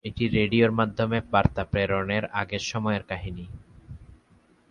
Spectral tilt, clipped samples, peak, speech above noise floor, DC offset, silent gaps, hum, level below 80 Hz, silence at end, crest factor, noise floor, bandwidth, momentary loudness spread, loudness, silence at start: -6 dB/octave; under 0.1%; -6 dBFS; 35 dB; under 0.1%; none; none; -44 dBFS; 0.55 s; 22 dB; -60 dBFS; 7.4 kHz; 19 LU; -25 LUFS; 0.05 s